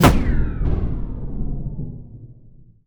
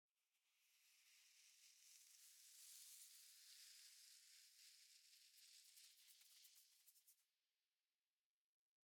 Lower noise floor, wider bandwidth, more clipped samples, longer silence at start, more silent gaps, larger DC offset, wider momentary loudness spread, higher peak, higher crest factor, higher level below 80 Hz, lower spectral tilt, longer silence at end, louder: second, -46 dBFS vs under -90 dBFS; first, over 20 kHz vs 18 kHz; neither; second, 0 s vs 0.15 s; neither; neither; first, 19 LU vs 7 LU; first, 0 dBFS vs -46 dBFS; about the same, 20 dB vs 24 dB; first, -24 dBFS vs under -90 dBFS; first, -6 dB/octave vs 5 dB/octave; second, 0.35 s vs 1.45 s; first, -25 LUFS vs -66 LUFS